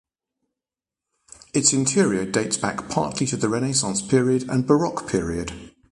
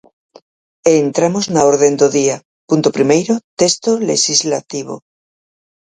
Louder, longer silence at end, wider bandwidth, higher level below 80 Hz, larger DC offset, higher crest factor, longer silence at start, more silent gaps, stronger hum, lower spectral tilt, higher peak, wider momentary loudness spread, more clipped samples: second, -22 LUFS vs -14 LUFS; second, 0.25 s vs 0.95 s; first, 11.5 kHz vs 9.6 kHz; first, -50 dBFS vs -58 dBFS; neither; about the same, 20 dB vs 16 dB; first, 1.55 s vs 0.85 s; second, none vs 2.45-2.68 s, 3.44-3.57 s; neither; about the same, -4 dB/octave vs -4 dB/octave; second, -4 dBFS vs 0 dBFS; second, 8 LU vs 12 LU; neither